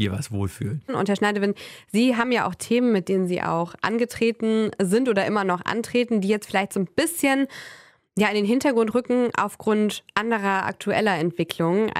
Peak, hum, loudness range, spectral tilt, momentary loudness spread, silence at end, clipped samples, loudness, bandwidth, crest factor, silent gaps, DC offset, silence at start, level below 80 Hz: -6 dBFS; none; 1 LU; -5.5 dB/octave; 6 LU; 0 s; under 0.1%; -23 LUFS; 16 kHz; 16 dB; none; under 0.1%; 0 s; -60 dBFS